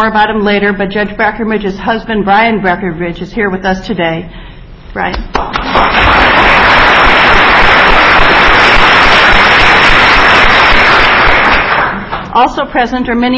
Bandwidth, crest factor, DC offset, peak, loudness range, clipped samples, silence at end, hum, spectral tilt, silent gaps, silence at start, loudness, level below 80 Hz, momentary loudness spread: 8 kHz; 8 dB; under 0.1%; 0 dBFS; 9 LU; 2%; 0 s; none; -4.5 dB/octave; none; 0 s; -7 LUFS; -22 dBFS; 11 LU